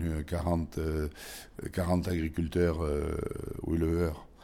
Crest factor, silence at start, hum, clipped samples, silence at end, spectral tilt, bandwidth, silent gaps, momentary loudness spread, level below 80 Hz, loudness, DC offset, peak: 16 dB; 0 s; none; under 0.1%; 0 s; -7 dB/octave; 16.5 kHz; none; 9 LU; -40 dBFS; -32 LUFS; under 0.1%; -16 dBFS